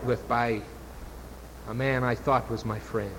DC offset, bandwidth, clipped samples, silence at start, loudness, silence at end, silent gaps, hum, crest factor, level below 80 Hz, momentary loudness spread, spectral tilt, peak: under 0.1%; 17 kHz; under 0.1%; 0 s; -28 LUFS; 0 s; none; none; 18 dB; -46 dBFS; 18 LU; -6.5 dB/octave; -10 dBFS